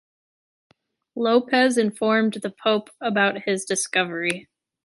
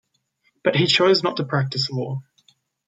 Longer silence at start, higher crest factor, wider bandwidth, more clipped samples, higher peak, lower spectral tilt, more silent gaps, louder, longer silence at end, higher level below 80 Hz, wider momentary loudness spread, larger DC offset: first, 1.15 s vs 0.65 s; about the same, 18 dB vs 18 dB; first, 11.5 kHz vs 9.4 kHz; neither; about the same, -6 dBFS vs -4 dBFS; second, -3.5 dB/octave vs -5 dB/octave; neither; about the same, -22 LUFS vs -20 LUFS; second, 0.45 s vs 0.65 s; second, -72 dBFS vs -64 dBFS; second, 7 LU vs 13 LU; neither